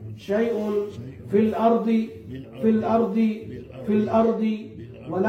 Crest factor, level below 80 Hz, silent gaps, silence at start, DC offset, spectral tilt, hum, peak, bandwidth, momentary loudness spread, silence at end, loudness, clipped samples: 16 dB; -58 dBFS; none; 0 s; under 0.1%; -8.5 dB/octave; none; -6 dBFS; 6.6 kHz; 18 LU; 0 s; -23 LUFS; under 0.1%